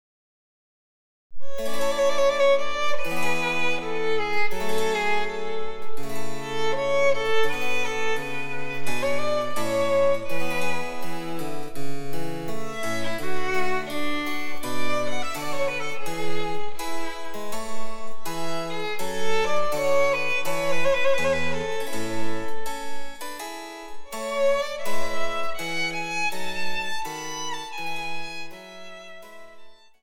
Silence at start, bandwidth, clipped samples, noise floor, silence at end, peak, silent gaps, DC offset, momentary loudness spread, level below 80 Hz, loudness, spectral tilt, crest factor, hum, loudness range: 1.3 s; 18.5 kHz; under 0.1%; -44 dBFS; 0.25 s; -10 dBFS; none; under 0.1%; 13 LU; -50 dBFS; -27 LUFS; -3.5 dB/octave; 12 dB; none; 6 LU